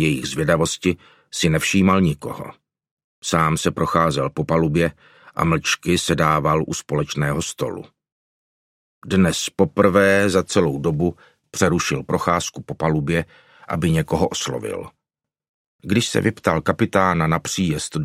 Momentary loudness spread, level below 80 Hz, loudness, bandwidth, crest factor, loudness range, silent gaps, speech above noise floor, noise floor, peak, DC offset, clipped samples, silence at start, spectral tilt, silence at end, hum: 11 LU; -44 dBFS; -20 LUFS; 15 kHz; 20 dB; 4 LU; 2.91-2.97 s, 3.04-3.22 s, 8.12-9.02 s, 15.49-15.79 s; 66 dB; -85 dBFS; 0 dBFS; under 0.1%; under 0.1%; 0 s; -5 dB/octave; 0 s; none